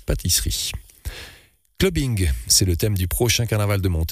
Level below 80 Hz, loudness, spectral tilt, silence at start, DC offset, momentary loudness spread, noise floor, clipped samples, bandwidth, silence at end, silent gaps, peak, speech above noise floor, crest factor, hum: -30 dBFS; -20 LUFS; -3.5 dB/octave; 0.1 s; under 0.1%; 18 LU; -51 dBFS; under 0.1%; 15.5 kHz; 0 s; none; -6 dBFS; 31 dB; 16 dB; none